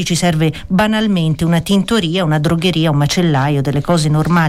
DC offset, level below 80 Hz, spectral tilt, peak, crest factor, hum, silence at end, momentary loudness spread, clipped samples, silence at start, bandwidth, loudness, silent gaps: under 0.1%; -36 dBFS; -5.5 dB/octave; -4 dBFS; 8 dB; none; 0 s; 2 LU; under 0.1%; 0 s; 15 kHz; -14 LUFS; none